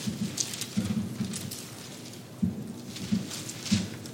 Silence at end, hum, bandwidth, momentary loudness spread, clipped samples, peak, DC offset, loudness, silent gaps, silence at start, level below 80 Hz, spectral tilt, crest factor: 0 s; none; 17 kHz; 11 LU; under 0.1%; -10 dBFS; under 0.1%; -33 LUFS; none; 0 s; -60 dBFS; -4 dB/octave; 24 dB